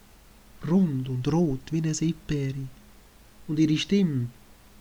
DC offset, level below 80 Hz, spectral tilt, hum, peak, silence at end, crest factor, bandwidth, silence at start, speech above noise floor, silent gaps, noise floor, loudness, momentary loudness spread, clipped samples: under 0.1%; -50 dBFS; -6.5 dB/octave; none; -12 dBFS; 0.5 s; 14 dB; over 20 kHz; 0.55 s; 27 dB; none; -53 dBFS; -26 LUFS; 13 LU; under 0.1%